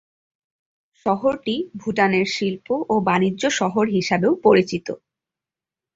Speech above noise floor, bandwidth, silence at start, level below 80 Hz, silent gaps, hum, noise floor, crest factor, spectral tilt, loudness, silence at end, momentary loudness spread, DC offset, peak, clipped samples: 69 dB; 7.8 kHz; 1.05 s; -60 dBFS; none; none; -89 dBFS; 20 dB; -5 dB/octave; -20 LUFS; 1 s; 9 LU; under 0.1%; -2 dBFS; under 0.1%